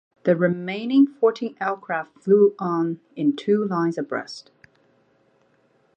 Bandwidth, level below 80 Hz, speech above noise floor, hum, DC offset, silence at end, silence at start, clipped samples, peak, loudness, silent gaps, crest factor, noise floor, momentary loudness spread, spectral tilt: 8.6 kHz; -76 dBFS; 41 dB; none; under 0.1%; 1.55 s; 0.25 s; under 0.1%; -6 dBFS; -22 LUFS; none; 16 dB; -63 dBFS; 11 LU; -7.5 dB/octave